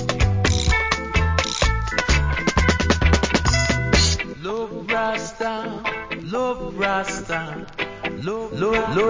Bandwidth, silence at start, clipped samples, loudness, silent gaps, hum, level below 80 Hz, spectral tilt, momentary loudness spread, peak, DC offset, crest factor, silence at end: 7.8 kHz; 0 s; under 0.1%; -21 LUFS; none; none; -26 dBFS; -4.5 dB/octave; 9 LU; -2 dBFS; under 0.1%; 18 dB; 0 s